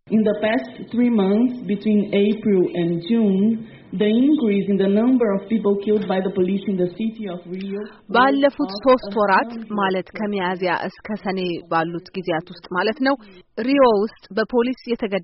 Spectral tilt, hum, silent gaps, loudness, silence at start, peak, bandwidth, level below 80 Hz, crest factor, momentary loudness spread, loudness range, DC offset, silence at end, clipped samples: -5 dB/octave; none; none; -20 LUFS; 0.05 s; -4 dBFS; 5.8 kHz; -56 dBFS; 16 dB; 10 LU; 5 LU; under 0.1%; 0 s; under 0.1%